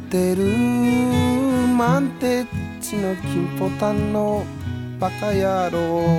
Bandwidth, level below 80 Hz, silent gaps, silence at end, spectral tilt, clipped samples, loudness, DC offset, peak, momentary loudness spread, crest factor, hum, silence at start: 17 kHz; -46 dBFS; none; 0 s; -6.5 dB/octave; under 0.1%; -21 LUFS; under 0.1%; -4 dBFS; 8 LU; 16 dB; none; 0 s